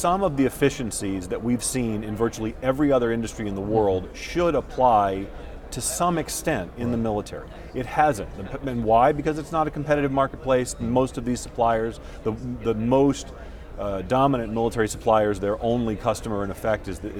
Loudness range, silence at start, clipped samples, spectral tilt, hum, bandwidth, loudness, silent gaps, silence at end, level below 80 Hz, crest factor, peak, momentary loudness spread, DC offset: 2 LU; 0 s; under 0.1%; -5.5 dB/octave; none; 18 kHz; -24 LUFS; none; 0 s; -40 dBFS; 18 dB; -6 dBFS; 11 LU; under 0.1%